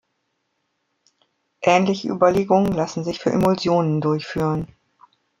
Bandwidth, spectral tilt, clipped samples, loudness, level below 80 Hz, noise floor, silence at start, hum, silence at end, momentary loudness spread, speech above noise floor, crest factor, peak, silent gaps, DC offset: 15.5 kHz; -6.5 dB/octave; under 0.1%; -20 LUFS; -52 dBFS; -73 dBFS; 1.6 s; none; 0.75 s; 7 LU; 54 dB; 20 dB; -2 dBFS; none; under 0.1%